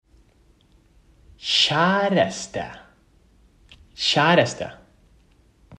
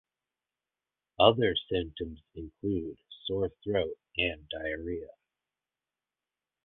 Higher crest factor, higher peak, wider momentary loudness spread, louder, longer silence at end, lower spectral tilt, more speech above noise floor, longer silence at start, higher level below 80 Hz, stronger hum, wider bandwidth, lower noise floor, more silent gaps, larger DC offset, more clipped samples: second, 22 dB vs 28 dB; about the same, -4 dBFS vs -6 dBFS; about the same, 16 LU vs 17 LU; first, -20 LUFS vs -31 LUFS; second, 0.05 s vs 1.55 s; second, -4 dB/octave vs -9 dB/octave; second, 37 dB vs over 59 dB; first, 1.4 s vs 1.2 s; about the same, -56 dBFS vs -54 dBFS; neither; first, 11 kHz vs 4.3 kHz; second, -58 dBFS vs under -90 dBFS; neither; neither; neither